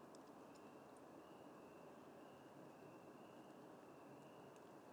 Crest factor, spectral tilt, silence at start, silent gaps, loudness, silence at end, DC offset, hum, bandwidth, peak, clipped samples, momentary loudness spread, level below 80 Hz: 14 dB; -5.5 dB/octave; 0 s; none; -62 LUFS; 0 s; under 0.1%; none; over 20 kHz; -46 dBFS; under 0.1%; 1 LU; under -90 dBFS